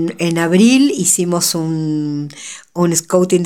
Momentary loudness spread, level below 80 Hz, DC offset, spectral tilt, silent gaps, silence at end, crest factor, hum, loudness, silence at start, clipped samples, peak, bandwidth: 14 LU; -62 dBFS; 0.2%; -4.5 dB/octave; none; 0 s; 14 dB; none; -14 LUFS; 0 s; under 0.1%; 0 dBFS; 17 kHz